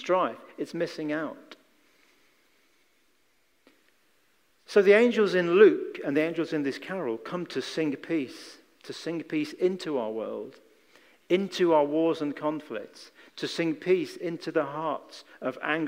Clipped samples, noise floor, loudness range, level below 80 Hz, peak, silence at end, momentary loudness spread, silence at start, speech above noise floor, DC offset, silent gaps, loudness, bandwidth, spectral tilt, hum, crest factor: under 0.1%; -70 dBFS; 10 LU; -84 dBFS; -6 dBFS; 0 s; 19 LU; 0 s; 43 dB; under 0.1%; none; -27 LUFS; 15.5 kHz; -5.5 dB/octave; none; 22 dB